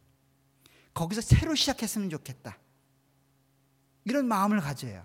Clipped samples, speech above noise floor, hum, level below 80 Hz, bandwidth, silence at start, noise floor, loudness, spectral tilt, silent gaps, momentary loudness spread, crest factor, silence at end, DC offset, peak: under 0.1%; 40 dB; none; -44 dBFS; 17 kHz; 0.95 s; -68 dBFS; -28 LUFS; -5 dB/octave; none; 18 LU; 24 dB; 0 s; under 0.1%; -8 dBFS